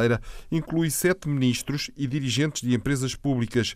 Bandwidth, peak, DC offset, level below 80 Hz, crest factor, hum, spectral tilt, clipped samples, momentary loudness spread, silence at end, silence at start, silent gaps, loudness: 15.5 kHz; -10 dBFS; under 0.1%; -46 dBFS; 14 dB; none; -5 dB/octave; under 0.1%; 6 LU; 0 s; 0 s; none; -26 LUFS